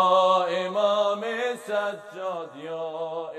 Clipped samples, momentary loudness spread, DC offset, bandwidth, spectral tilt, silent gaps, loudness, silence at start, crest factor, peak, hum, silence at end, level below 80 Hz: under 0.1%; 13 LU; under 0.1%; 12.5 kHz; -4 dB/octave; none; -26 LUFS; 0 s; 16 dB; -8 dBFS; none; 0 s; -90 dBFS